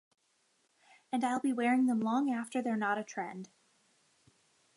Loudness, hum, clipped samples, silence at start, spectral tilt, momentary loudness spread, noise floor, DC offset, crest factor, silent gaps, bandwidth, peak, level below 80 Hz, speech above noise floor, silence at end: -33 LUFS; none; under 0.1%; 1.1 s; -5 dB/octave; 12 LU; -74 dBFS; under 0.1%; 16 dB; none; 11.5 kHz; -20 dBFS; -88 dBFS; 42 dB; 1.3 s